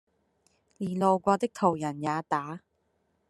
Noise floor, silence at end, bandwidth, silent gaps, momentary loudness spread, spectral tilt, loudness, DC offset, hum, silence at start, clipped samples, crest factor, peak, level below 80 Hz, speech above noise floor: -74 dBFS; 0.7 s; 12.5 kHz; none; 12 LU; -6.5 dB/octave; -28 LUFS; under 0.1%; none; 0.8 s; under 0.1%; 22 dB; -8 dBFS; -70 dBFS; 46 dB